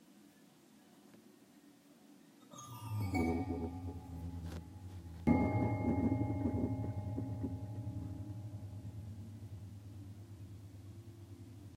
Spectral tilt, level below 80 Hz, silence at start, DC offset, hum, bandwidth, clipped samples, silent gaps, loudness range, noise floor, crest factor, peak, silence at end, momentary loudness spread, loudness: -8 dB/octave; -56 dBFS; 0 s; under 0.1%; none; 16 kHz; under 0.1%; none; 12 LU; -63 dBFS; 24 dB; -16 dBFS; 0 s; 19 LU; -40 LUFS